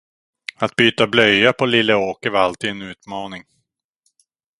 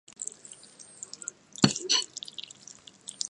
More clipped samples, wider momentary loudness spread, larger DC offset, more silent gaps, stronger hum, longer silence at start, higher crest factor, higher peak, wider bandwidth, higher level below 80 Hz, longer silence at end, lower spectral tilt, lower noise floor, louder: neither; about the same, 19 LU vs 21 LU; neither; neither; neither; first, 0.6 s vs 0.2 s; second, 20 dB vs 30 dB; about the same, 0 dBFS vs -2 dBFS; about the same, 11.5 kHz vs 11.5 kHz; first, -56 dBFS vs -66 dBFS; first, 1.2 s vs 0 s; first, -4.5 dB/octave vs -2.5 dB/octave; first, -72 dBFS vs -52 dBFS; first, -16 LUFS vs -29 LUFS